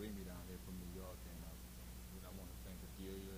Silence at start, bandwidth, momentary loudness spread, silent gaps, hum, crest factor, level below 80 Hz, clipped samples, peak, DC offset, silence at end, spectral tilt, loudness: 0 s; over 20 kHz; 4 LU; none; 60 Hz at -55 dBFS; 14 dB; -56 dBFS; under 0.1%; -36 dBFS; under 0.1%; 0 s; -5 dB/octave; -53 LUFS